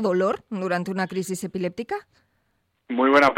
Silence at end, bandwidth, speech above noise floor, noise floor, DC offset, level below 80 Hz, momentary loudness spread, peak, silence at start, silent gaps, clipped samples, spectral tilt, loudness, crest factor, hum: 0 s; 16.5 kHz; 48 dB; -71 dBFS; under 0.1%; -64 dBFS; 12 LU; -6 dBFS; 0 s; none; under 0.1%; -5.5 dB/octave; -25 LUFS; 18 dB; none